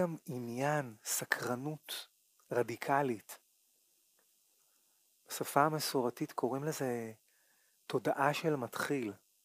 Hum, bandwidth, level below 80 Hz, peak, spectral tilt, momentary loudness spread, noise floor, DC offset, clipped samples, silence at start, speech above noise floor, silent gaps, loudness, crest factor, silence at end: none; 15.5 kHz; -86 dBFS; -12 dBFS; -4.5 dB/octave; 12 LU; -73 dBFS; under 0.1%; under 0.1%; 0 s; 37 dB; none; -36 LUFS; 24 dB; 0.3 s